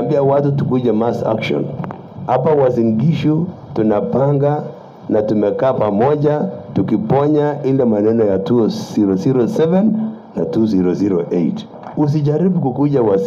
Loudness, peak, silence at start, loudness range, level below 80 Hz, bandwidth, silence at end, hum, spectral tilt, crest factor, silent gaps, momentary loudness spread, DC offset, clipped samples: -16 LUFS; -4 dBFS; 0 s; 2 LU; -52 dBFS; 7.2 kHz; 0 s; none; -9 dB/octave; 12 dB; none; 7 LU; under 0.1%; under 0.1%